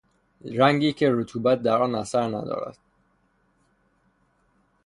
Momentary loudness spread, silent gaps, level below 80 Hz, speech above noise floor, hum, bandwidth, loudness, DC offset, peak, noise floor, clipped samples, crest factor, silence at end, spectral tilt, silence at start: 13 LU; none; -62 dBFS; 44 dB; none; 11 kHz; -23 LUFS; under 0.1%; -4 dBFS; -67 dBFS; under 0.1%; 22 dB; 2.15 s; -6 dB/octave; 0.45 s